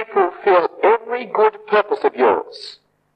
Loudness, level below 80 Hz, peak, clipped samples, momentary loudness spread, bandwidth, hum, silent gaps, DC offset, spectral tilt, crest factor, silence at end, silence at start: -17 LUFS; -70 dBFS; -2 dBFS; under 0.1%; 11 LU; 8.8 kHz; none; none; under 0.1%; -5.5 dB/octave; 16 dB; 0.45 s; 0 s